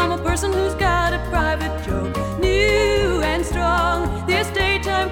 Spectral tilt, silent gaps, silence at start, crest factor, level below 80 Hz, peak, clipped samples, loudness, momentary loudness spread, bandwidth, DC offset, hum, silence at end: -5 dB/octave; none; 0 s; 14 dB; -28 dBFS; -4 dBFS; under 0.1%; -20 LUFS; 7 LU; 18 kHz; under 0.1%; none; 0 s